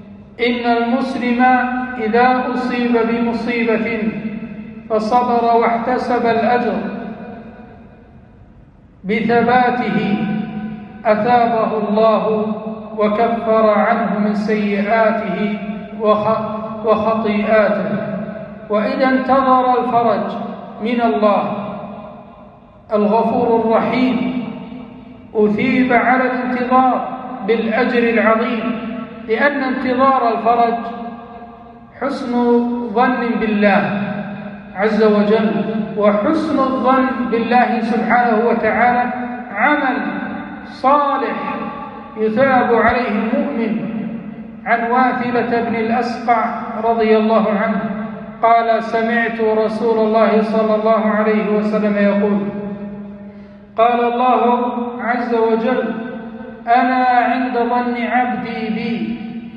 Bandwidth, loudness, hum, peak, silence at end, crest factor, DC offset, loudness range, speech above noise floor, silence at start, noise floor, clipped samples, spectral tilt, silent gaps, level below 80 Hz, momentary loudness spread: 6.8 kHz; -16 LUFS; none; -2 dBFS; 0 s; 16 dB; under 0.1%; 3 LU; 29 dB; 0 s; -44 dBFS; under 0.1%; -8 dB/octave; none; -52 dBFS; 13 LU